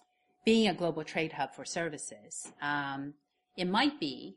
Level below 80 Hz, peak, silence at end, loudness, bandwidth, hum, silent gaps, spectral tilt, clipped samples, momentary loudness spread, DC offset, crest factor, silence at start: -70 dBFS; -14 dBFS; 0.05 s; -33 LUFS; 11.5 kHz; none; none; -4 dB/octave; under 0.1%; 15 LU; under 0.1%; 18 dB; 0.45 s